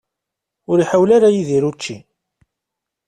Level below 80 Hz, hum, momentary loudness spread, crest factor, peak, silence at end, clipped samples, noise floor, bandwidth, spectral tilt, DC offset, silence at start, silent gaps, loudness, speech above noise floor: -58 dBFS; none; 17 LU; 16 dB; -2 dBFS; 1.1 s; under 0.1%; -82 dBFS; 10 kHz; -6.5 dB/octave; under 0.1%; 0.7 s; none; -15 LUFS; 67 dB